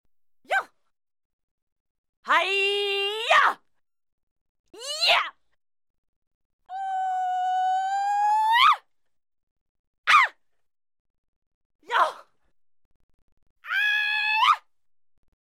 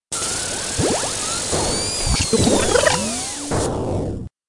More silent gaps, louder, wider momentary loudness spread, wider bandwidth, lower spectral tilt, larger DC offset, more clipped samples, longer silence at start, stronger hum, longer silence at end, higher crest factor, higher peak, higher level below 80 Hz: first, 1.25-2.23 s, 4.13-4.64 s, 5.90-6.59 s, 9.43-10.04 s, 11.00-11.79 s, 12.85-13.37 s, 13.50-13.56 s vs none; second, -22 LUFS vs -19 LUFS; first, 12 LU vs 8 LU; first, 16 kHz vs 11.5 kHz; second, 1 dB/octave vs -3 dB/octave; neither; neither; first, 0.5 s vs 0.1 s; neither; first, 0.95 s vs 0.2 s; about the same, 20 dB vs 20 dB; second, -6 dBFS vs 0 dBFS; second, -78 dBFS vs -34 dBFS